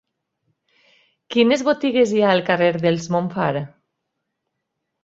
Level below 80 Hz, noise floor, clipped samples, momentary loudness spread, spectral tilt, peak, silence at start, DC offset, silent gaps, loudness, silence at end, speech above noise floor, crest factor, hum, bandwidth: -62 dBFS; -78 dBFS; under 0.1%; 7 LU; -5.5 dB/octave; -2 dBFS; 1.3 s; under 0.1%; none; -19 LUFS; 1.35 s; 60 dB; 18 dB; none; 8 kHz